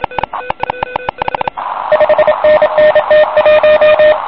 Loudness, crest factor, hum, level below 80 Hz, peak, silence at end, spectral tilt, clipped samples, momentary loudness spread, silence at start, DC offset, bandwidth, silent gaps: -10 LUFS; 8 dB; none; -42 dBFS; -2 dBFS; 0 s; -9 dB/octave; under 0.1%; 12 LU; 0 s; 0.8%; 5.2 kHz; none